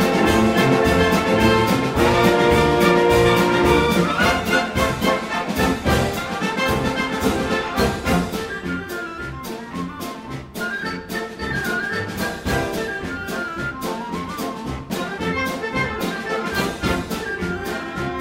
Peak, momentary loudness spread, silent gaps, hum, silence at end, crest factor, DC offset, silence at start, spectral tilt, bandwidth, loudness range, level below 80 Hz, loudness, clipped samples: -2 dBFS; 12 LU; none; none; 0 s; 18 dB; under 0.1%; 0 s; -5 dB/octave; 16.5 kHz; 10 LU; -36 dBFS; -20 LUFS; under 0.1%